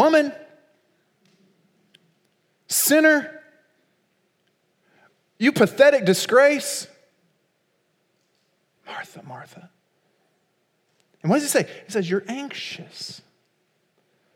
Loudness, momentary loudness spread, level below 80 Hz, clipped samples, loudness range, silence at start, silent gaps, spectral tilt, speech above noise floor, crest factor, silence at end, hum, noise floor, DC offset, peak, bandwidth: -20 LUFS; 23 LU; -80 dBFS; under 0.1%; 23 LU; 0 s; none; -3.5 dB/octave; 49 dB; 22 dB; 1.2 s; none; -69 dBFS; under 0.1%; -2 dBFS; 17.5 kHz